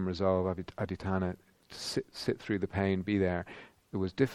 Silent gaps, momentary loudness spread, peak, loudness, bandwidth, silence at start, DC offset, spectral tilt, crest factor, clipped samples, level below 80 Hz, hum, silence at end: none; 12 LU; -12 dBFS; -34 LUFS; 13 kHz; 0 s; under 0.1%; -6.5 dB/octave; 20 dB; under 0.1%; -58 dBFS; none; 0 s